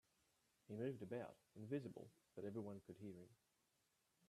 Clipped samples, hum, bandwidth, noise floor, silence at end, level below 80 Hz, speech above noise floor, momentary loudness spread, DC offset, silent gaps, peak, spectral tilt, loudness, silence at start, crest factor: under 0.1%; none; 13.5 kHz; -85 dBFS; 0.95 s; -88 dBFS; 33 dB; 12 LU; under 0.1%; none; -34 dBFS; -8 dB/octave; -53 LUFS; 0.7 s; 20 dB